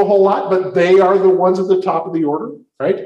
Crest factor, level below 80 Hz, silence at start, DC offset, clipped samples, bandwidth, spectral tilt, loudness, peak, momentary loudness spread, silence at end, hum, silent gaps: 12 dB; -64 dBFS; 0 s; under 0.1%; under 0.1%; 7.2 kHz; -7.5 dB/octave; -14 LUFS; -2 dBFS; 10 LU; 0 s; none; none